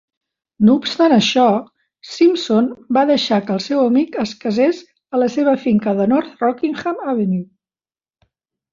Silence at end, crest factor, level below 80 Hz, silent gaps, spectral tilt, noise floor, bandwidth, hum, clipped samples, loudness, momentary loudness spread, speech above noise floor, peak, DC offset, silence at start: 1.3 s; 14 dB; -60 dBFS; none; -6 dB/octave; under -90 dBFS; 7.6 kHz; none; under 0.1%; -17 LUFS; 8 LU; over 74 dB; -2 dBFS; under 0.1%; 0.6 s